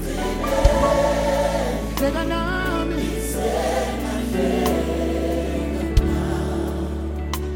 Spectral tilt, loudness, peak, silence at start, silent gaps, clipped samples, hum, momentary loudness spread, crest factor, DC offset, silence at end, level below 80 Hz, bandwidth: -5.5 dB/octave; -22 LUFS; -2 dBFS; 0 s; none; under 0.1%; none; 6 LU; 20 dB; under 0.1%; 0 s; -28 dBFS; 17 kHz